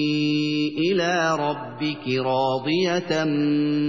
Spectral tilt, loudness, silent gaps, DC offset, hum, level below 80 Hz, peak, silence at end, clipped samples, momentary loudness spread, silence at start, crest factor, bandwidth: -5.5 dB/octave; -23 LUFS; none; 0.2%; none; -70 dBFS; -10 dBFS; 0 s; under 0.1%; 5 LU; 0 s; 12 dB; 7.4 kHz